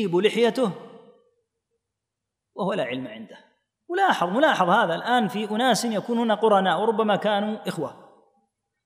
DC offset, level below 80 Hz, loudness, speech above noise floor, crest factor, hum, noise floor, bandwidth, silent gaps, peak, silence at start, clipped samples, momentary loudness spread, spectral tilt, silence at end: under 0.1%; -82 dBFS; -23 LUFS; 62 dB; 18 dB; none; -84 dBFS; 15.5 kHz; none; -6 dBFS; 0 s; under 0.1%; 13 LU; -4.5 dB/octave; 0.9 s